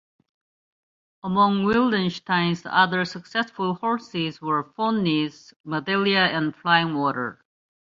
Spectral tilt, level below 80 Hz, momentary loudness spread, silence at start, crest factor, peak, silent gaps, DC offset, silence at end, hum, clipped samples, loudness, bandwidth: -6 dB/octave; -62 dBFS; 9 LU; 1.25 s; 20 dB; -4 dBFS; 5.56-5.64 s; under 0.1%; 0.6 s; none; under 0.1%; -23 LUFS; 7.6 kHz